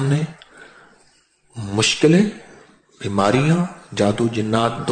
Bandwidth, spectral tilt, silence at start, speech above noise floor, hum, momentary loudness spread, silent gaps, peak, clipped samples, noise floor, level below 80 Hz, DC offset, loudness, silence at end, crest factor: 9.4 kHz; -5.5 dB/octave; 0 s; 40 dB; none; 16 LU; none; -4 dBFS; under 0.1%; -57 dBFS; -54 dBFS; under 0.1%; -19 LUFS; 0 s; 16 dB